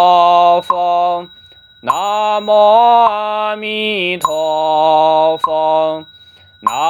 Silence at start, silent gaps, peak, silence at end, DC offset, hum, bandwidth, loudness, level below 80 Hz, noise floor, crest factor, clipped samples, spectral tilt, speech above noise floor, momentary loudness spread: 0 s; none; 0 dBFS; 0 s; under 0.1%; none; 19.5 kHz; -13 LUFS; -62 dBFS; -43 dBFS; 12 dB; under 0.1%; -3.5 dB/octave; 32 dB; 10 LU